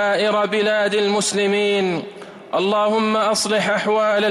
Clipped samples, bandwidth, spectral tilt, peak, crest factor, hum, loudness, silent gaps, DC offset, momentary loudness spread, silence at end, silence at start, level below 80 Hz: under 0.1%; 15.5 kHz; -3.5 dB/octave; -8 dBFS; 10 dB; none; -18 LUFS; none; under 0.1%; 6 LU; 0 s; 0 s; -66 dBFS